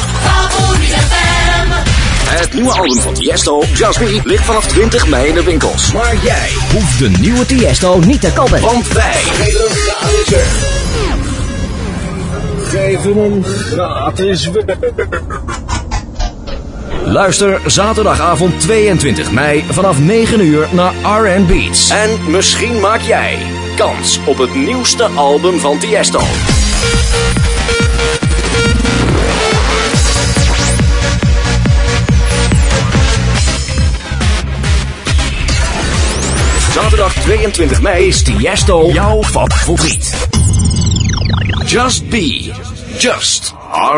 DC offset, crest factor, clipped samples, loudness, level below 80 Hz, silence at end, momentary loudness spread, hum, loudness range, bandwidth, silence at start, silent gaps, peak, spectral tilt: under 0.1%; 10 dB; under 0.1%; -11 LUFS; -18 dBFS; 0 s; 6 LU; none; 4 LU; 11 kHz; 0 s; none; 0 dBFS; -4 dB/octave